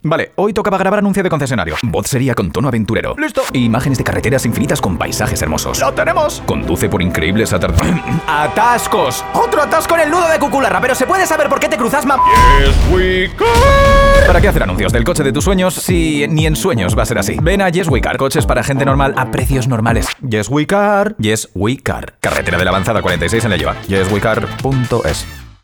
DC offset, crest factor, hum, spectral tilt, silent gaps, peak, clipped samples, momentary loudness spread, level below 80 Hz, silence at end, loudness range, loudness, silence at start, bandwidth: under 0.1%; 12 dB; none; -5 dB/octave; none; 0 dBFS; 0.1%; 7 LU; -22 dBFS; 0.15 s; 5 LU; -13 LUFS; 0.05 s; over 20 kHz